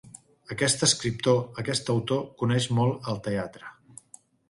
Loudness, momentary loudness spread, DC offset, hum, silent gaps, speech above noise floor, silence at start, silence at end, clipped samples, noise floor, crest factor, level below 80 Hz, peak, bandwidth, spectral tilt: -26 LUFS; 14 LU; under 0.1%; none; none; 29 dB; 0.05 s; 0.8 s; under 0.1%; -55 dBFS; 20 dB; -60 dBFS; -8 dBFS; 11.5 kHz; -4 dB/octave